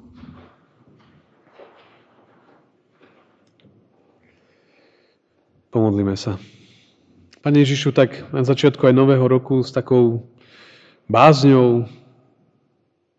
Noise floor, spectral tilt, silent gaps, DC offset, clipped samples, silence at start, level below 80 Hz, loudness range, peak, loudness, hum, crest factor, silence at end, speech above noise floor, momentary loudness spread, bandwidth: -67 dBFS; -7.5 dB/octave; none; under 0.1%; under 0.1%; 5.75 s; -62 dBFS; 10 LU; 0 dBFS; -16 LUFS; none; 20 dB; 1.3 s; 52 dB; 14 LU; 8 kHz